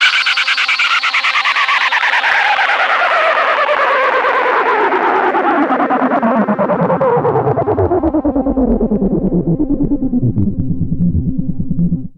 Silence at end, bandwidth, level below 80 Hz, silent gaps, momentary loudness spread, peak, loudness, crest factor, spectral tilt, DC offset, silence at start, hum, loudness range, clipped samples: 0.1 s; 10.5 kHz; -30 dBFS; none; 5 LU; 0 dBFS; -13 LUFS; 14 dB; -5.5 dB/octave; under 0.1%; 0 s; none; 4 LU; under 0.1%